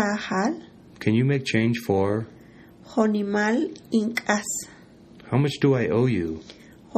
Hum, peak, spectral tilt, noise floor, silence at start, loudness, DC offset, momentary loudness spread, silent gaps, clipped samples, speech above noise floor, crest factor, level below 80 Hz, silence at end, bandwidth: none; -6 dBFS; -6 dB/octave; -48 dBFS; 0 s; -24 LUFS; under 0.1%; 9 LU; none; under 0.1%; 25 dB; 18 dB; -58 dBFS; 0 s; 14 kHz